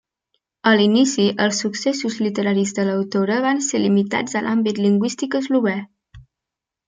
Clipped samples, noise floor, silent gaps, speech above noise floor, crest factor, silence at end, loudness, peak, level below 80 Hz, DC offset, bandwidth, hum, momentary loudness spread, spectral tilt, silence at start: under 0.1%; -85 dBFS; none; 67 dB; 16 dB; 0.65 s; -19 LUFS; -2 dBFS; -60 dBFS; under 0.1%; 9.4 kHz; none; 6 LU; -4.5 dB/octave; 0.65 s